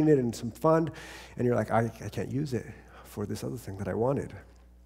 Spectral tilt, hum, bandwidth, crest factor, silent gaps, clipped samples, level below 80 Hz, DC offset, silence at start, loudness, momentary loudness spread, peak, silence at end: -7.5 dB/octave; none; 16 kHz; 20 dB; none; under 0.1%; -54 dBFS; under 0.1%; 0 s; -30 LUFS; 18 LU; -10 dBFS; 0.4 s